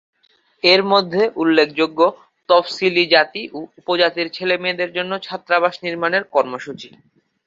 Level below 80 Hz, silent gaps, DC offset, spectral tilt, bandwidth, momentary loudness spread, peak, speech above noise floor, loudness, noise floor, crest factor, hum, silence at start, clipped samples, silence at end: -66 dBFS; none; under 0.1%; -5 dB/octave; 7.6 kHz; 12 LU; 0 dBFS; 42 dB; -17 LUFS; -59 dBFS; 18 dB; none; 0.65 s; under 0.1%; 0.6 s